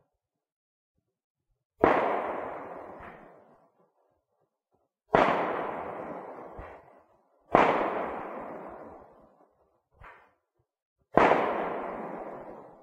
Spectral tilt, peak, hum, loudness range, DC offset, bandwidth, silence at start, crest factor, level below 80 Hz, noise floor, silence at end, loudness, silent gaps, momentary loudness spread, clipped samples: -6.5 dB/octave; -2 dBFS; none; 4 LU; under 0.1%; 9.8 kHz; 1.8 s; 30 dB; -58 dBFS; -84 dBFS; 0.1 s; -28 LUFS; 10.82-10.96 s; 22 LU; under 0.1%